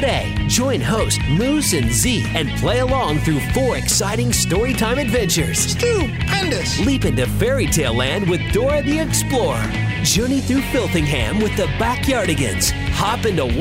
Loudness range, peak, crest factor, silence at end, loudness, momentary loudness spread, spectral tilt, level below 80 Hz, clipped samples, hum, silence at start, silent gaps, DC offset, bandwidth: 1 LU; -4 dBFS; 14 dB; 0 s; -18 LUFS; 3 LU; -4 dB/octave; -28 dBFS; under 0.1%; none; 0 s; none; under 0.1%; 16.5 kHz